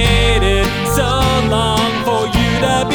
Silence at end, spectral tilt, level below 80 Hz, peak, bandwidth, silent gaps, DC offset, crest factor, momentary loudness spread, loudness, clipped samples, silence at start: 0 s; -4.5 dB/octave; -22 dBFS; -2 dBFS; 19 kHz; none; under 0.1%; 12 dB; 3 LU; -14 LUFS; under 0.1%; 0 s